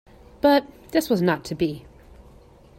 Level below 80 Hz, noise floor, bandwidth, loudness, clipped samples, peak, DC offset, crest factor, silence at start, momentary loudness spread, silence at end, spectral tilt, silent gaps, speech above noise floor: -52 dBFS; -50 dBFS; 16.5 kHz; -23 LUFS; under 0.1%; -6 dBFS; under 0.1%; 18 dB; 0.45 s; 8 LU; 1 s; -6 dB/octave; none; 28 dB